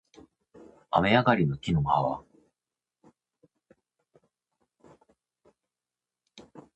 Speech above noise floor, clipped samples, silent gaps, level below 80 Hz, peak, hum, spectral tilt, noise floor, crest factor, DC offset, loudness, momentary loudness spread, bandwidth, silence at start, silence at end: over 65 dB; under 0.1%; none; -54 dBFS; -6 dBFS; none; -7.5 dB/octave; under -90 dBFS; 26 dB; under 0.1%; -26 LUFS; 8 LU; 8.4 kHz; 0.9 s; 0.15 s